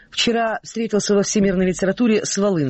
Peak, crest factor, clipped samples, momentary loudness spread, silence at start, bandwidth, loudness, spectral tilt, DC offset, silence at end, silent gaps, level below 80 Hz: -8 dBFS; 12 dB; under 0.1%; 5 LU; 0.15 s; 8.6 kHz; -19 LUFS; -4.5 dB/octave; under 0.1%; 0 s; none; -46 dBFS